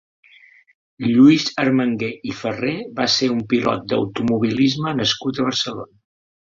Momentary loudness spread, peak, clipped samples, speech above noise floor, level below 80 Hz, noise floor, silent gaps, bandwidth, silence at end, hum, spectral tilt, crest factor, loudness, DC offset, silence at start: 13 LU; -2 dBFS; under 0.1%; 31 dB; -56 dBFS; -50 dBFS; none; 7.6 kHz; 0.7 s; none; -5 dB/octave; 18 dB; -19 LUFS; under 0.1%; 1 s